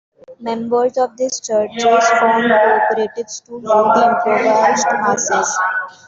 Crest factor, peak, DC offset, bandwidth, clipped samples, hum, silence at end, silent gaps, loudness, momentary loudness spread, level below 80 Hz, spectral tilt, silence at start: 14 dB; -2 dBFS; under 0.1%; 7.8 kHz; under 0.1%; none; 0.2 s; none; -15 LUFS; 11 LU; -62 dBFS; -2.5 dB/octave; 0.3 s